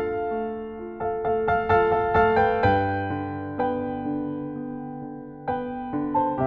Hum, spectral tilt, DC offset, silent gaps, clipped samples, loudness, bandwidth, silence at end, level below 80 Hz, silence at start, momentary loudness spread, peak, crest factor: none; -5.5 dB/octave; under 0.1%; none; under 0.1%; -25 LUFS; 5.2 kHz; 0 s; -46 dBFS; 0 s; 14 LU; -8 dBFS; 16 dB